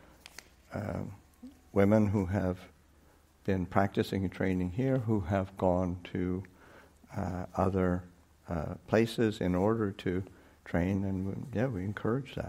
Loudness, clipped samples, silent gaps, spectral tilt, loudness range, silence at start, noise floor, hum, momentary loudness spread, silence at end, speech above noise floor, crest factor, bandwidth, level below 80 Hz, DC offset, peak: -32 LUFS; under 0.1%; none; -8 dB/octave; 2 LU; 0.7 s; -62 dBFS; none; 14 LU; 0 s; 31 dB; 22 dB; 15.5 kHz; -56 dBFS; under 0.1%; -10 dBFS